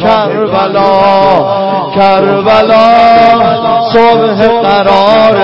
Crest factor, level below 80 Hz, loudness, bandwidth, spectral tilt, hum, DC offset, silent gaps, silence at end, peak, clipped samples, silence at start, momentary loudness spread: 6 dB; -40 dBFS; -6 LUFS; 8 kHz; -7 dB/octave; none; 1%; none; 0 s; 0 dBFS; 1%; 0 s; 6 LU